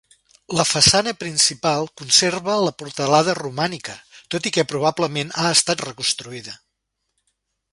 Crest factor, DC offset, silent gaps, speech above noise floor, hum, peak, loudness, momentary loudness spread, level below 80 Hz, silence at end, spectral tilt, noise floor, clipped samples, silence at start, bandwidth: 22 dB; under 0.1%; none; 56 dB; none; 0 dBFS; -19 LUFS; 14 LU; -52 dBFS; 1.2 s; -2.5 dB/octave; -76 dBFS; under 0.1%; 0.5 s; 11.5 kHz